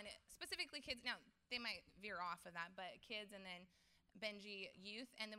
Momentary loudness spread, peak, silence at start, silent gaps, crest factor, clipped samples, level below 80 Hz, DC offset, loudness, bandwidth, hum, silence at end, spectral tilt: 8 LU; -30 dBFS; 0 s; none; 22 dB; under 0.1%; -80 dBFS; under 0.1%; -50 LUFS; 15.5 kHz; none; 0 s; -2.5 dB/octave